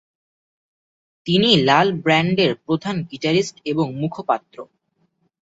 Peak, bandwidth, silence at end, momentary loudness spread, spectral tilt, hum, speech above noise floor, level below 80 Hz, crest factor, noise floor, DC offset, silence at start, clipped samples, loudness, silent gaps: -2 dBFS; 8 kHz; 0.9 s; 10 LU; -5.5 dB/octave; none; 48 dB; -60 dBFS; 20 dB; -67 dBFS; under 0.1%; 1.25 s; under 0.1%; -19 LUFS; none